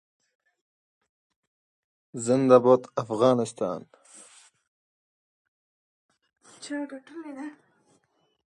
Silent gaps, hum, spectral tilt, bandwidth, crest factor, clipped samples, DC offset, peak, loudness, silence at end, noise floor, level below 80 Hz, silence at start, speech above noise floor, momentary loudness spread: 4.67-6.09 s; none; -6 dB/octave; 10.5 kHz; 24 dB; under 0.1%; under 0.1%; -4 dBFS; -24 LUFS; 0.95 s; -70 dBFS; -76 dBFS; 2.15 s; 46 dB; 23 LU